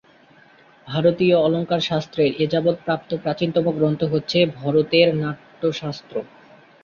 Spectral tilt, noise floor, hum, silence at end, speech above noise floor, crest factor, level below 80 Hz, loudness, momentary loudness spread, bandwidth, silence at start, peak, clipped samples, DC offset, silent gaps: -7 dB/octave; -52 dBFS; none; 0.6 s; 32 dB; 18 dB; -58 dBFS; -20 LUFS; 12 LU; 7 kHz; 0.85 s; -4 dBFS; under 0.1%; under 0.1%; none